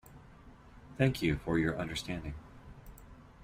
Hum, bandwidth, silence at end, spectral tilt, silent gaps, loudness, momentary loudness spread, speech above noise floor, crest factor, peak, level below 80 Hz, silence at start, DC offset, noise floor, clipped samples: none; 16 kHz; 0 s; -6 dB/octave; none; -33 LUFS; 24 LU; 23 dB; 20 dB; -16 dBFS; -52 dBFS; 0.05 s; under 0.1%; -55 dBFS; under 0.1%